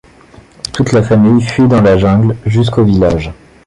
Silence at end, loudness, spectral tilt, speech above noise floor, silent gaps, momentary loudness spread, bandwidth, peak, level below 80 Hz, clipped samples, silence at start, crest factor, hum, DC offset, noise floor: 0.35 s; -10 LUFS; -7.5 dB/octave; 31 dB; none; 10 LU; 11 kHz; 0 dBFS; -30 dBFS; under 0.1%; 0.65 s; 10 dB; none; under 0.1%; -40 dBFS